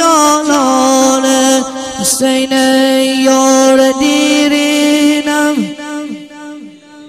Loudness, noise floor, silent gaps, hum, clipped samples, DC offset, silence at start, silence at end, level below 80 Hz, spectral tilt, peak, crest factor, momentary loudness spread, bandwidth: -10 LUFS; -33 dBFS; none; none; under 0.1%; under 0.1%; 0 s; 0 s; -50 dBFS; -2 dB/octave; 0 dBFS; 10 dB; 14 LU; 15.5 kHz